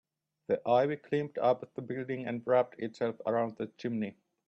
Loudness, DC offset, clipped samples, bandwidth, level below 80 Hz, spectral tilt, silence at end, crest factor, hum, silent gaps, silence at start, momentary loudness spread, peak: -32 LUFS; under 0.1%; under 0.1%; 7.8 kHz; -78 dBFS; -8 dB/octave; 0.35 s; 18 dB; none; none; 0.5 s; 10 LU; -14 dBFS